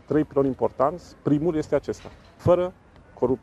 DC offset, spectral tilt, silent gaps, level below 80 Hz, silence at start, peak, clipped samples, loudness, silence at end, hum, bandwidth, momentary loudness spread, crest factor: under 0.1%; -8.5 dB/octave; none; -50 dBFS; 0.1 s; -6 dBFS; under 0.1%; -25 LUFS; 0.05 s; none; 11.5 kHz; 9 LU; 18 dB